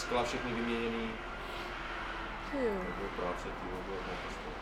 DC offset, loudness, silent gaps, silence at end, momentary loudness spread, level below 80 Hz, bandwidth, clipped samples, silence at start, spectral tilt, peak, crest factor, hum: under 0.1%; -38 LUFS; none; 0 s; 6 LU; -48 dBFS; 16 kHz; under 0.1%; 0 s; -5 dB/octave; -20 dBFS; 18 dB; none